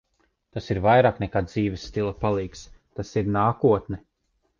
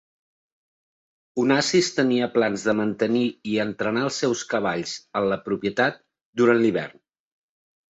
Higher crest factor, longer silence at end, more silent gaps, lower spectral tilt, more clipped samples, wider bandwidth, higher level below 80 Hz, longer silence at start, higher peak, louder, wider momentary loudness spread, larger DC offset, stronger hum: about the same, 18 dB vs 18 dB; second, 0.6 s vs 1.05 s; second, none vs 6.25-6.33 s; first, -7.5 dB/octave vs -4.5 dB/octave; neither; second, 7.4 kHz vs 8.2 kHz; first, -46 dBFS vs -64 dBFS; second, 0.55 s vs 1.35 s; about the same, -6 dBFS vs -6 dBFS; about the same, -23 LUFS vs -23 LUFS; first, 18 LU vs 8 LU; neither; neither